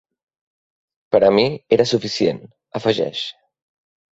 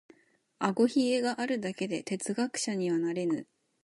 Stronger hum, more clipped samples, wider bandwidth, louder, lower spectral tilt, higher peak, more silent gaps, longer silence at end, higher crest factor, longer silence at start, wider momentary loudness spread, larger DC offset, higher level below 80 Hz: neither; neither; second, 8 kHz vs 11.5 kHz; first, -18 LUFS vs -31 LUFS; about the same, -5 dB/octave vs -4.5 dB/octave; first, -2 dBFS vs -10 dBFS; neither; first, 0.8 s vs 0.4 s; about the same, 18 dB vs 20 dB; first, 1.1 s vs 0.6 s; first, 14 LU vs 7 LU; neither; first, -58 dBFS vs -80 dBFS